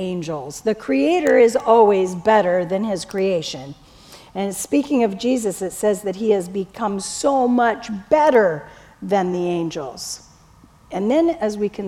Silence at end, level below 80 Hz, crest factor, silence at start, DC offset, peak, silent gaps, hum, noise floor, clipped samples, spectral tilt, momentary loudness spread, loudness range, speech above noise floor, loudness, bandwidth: 0 s; -54 dBFS; 18 dB; 0 s; under 0.1%; -2 dBFS; none; none; -49 dBFS; under 0.1%; -5 dB/octave; 15 LU; 5 LU; 31 dB; -19 LUFS; 16.5 kHz